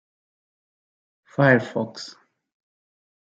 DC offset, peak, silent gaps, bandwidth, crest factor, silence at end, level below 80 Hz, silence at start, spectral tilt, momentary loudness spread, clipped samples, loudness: under 0.1%; -4 dBFS; none; 7.8 kHz; 24 dB; 1.25 s; -72 dBFS; 1.4 s; -7 dB/octave; 20 LU; under 0.1%; -21 LUFS